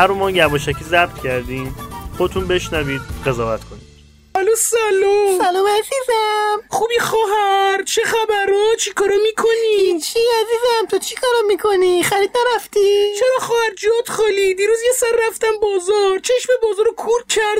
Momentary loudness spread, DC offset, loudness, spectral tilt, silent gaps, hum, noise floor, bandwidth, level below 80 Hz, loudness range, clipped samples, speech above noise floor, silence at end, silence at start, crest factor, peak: 6 LU; under 0.1%; -16 LUFS; -3 dB/octave; none; none; -45 dBFS; 16 kHz; -40 dBFS; 4 LU; under 0.1%; 29 dB; 0 s; 0 s; 16 dB; 0 dBFS